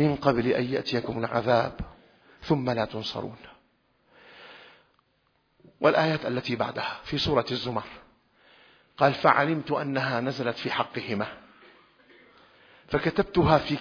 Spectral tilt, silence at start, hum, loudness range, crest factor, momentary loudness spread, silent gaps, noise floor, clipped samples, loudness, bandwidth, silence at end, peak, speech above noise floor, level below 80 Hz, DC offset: -7 dB/octave; 0 s; none; 7 LU; 24 dB; 14 LU; none; -70 dBFS; under 0.1%; -26 LUFS; 5.4 kHz; 0 s; -4 dBFS; 44 dB; -52 dBFS; under 0.1%